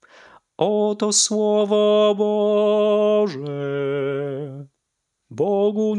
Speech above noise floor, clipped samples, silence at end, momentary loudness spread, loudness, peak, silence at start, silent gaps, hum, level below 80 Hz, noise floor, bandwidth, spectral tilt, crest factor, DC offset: 58 dB; under 0.1%; 0 s; 11 LU; -19 LUFS; -6 dBFS; 0.6 s; none; none; -82 dBFS; -77 dBFS; 11 kHz; -4 dB/octave; 14 dB; under 0.1%